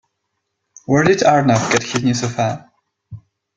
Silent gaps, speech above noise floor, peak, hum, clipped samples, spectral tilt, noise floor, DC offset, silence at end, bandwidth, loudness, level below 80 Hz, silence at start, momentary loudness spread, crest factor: none; 59 dB; -2 dBFS; none; under 0.1%; -5 dB/octave; -74 dBFS; under 0.1%; 0.4 s; 9.4 kHz; -16 LUFS; -52 dBFS; 0.9 s; 9 LU; 16 dB